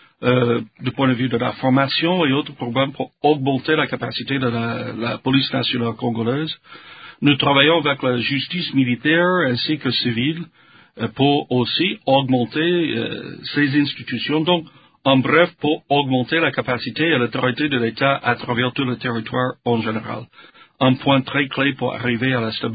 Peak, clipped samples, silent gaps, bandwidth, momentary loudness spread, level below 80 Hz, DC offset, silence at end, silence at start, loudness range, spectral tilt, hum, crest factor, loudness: 0 dBFS; under 0.1%; none; 5 kHz; 8 LU; -56 dBFS; under 0.1%; 0 s; 0.2 s; 3 LU; -11 dB/octave; none; 20 dB; -19 LUFS